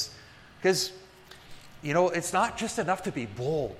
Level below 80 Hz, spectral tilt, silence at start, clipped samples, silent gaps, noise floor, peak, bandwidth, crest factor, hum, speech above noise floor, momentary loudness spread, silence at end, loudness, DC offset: -58 dBFS; -4 dB/octave; 0 s; under 0.1%; none; -51 dBFS; -10 dBFS; 15.5 kHz; 20 dB; none; 23 dB; 23 LU; 0 s; -29 LUFS; under 0.1%